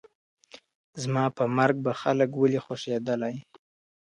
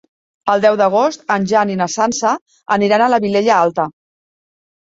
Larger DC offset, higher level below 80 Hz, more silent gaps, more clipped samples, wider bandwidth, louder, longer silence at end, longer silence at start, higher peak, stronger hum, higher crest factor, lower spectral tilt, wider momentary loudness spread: neither; second, -72 dBFS vs -60 dBFS; first, 0.75-0.93 s vs 2.41-2.46 s; neither; first, 11 kHz vs 7.8 kHz; second, -27 LUFS vs -15 LUFS; second, 0.7 s vs 0.95 s; about the same, 0.55 s vs 0.45 s; second, -10 dBFS vs -2 dBFS; neither; about the same, 18 dB vs 14 dB; first, -6.5 dB/octave vs -4.5 dB/octave; first, 11 LU vs 8 LU